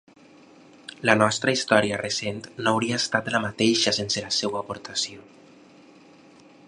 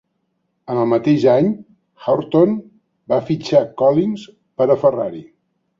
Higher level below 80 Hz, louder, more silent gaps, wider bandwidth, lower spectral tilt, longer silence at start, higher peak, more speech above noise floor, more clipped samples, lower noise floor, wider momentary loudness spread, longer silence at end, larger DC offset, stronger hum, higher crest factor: about the same, -62 dBFS vs -60 dBFS; second, -23 LUFS vs -17 LUFS; neither; first, 11.5 kHz vs 7.4 kHz; second, -3 dB/octave vs -8 dB/octave; first, 1 s vs 0.7 s; about the same, 0 dBFS vs -2 dBFS; second, 28 dB vs 54 dB; neither; second, -52 dBFS vs -70 dBFS; about the same, 11 LU vs 13 LU; first, 1.45 s vs 0.55 s; neither; neither; first, 26 dB vs 16 dB